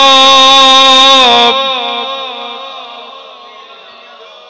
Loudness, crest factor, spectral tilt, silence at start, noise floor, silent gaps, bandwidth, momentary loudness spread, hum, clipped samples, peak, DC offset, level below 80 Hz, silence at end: -4 LUFS; 8 dB; 0 dB/octave; 0 s; -34 dBFS; none; 8 kHz; 22 LU; none; under 0.1%; 0 dBFS; under 0.1%; -48 dBFS; 1.2 s